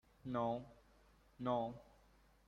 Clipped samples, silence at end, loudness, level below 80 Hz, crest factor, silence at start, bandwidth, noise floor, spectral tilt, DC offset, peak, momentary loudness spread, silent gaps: under 0.1%; 0.65 s; -43 LUFS; -70 dBFS; 20 dB; 0.25 s; 9.8 kHz; -70 dBFS; -8 dB/octave; under 0.1%; -26 dBFS; 15 LU; none